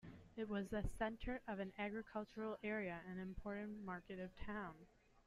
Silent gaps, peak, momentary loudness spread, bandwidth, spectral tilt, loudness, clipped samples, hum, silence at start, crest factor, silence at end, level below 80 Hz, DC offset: none; -30 dBFS; 7 LU; 13.5 kHz; -7 dB/octave; -48 LUFS; under 0.1%; none; 0.05 s; 18 dB; 0.05 s; -60 dBFS; under 0.1%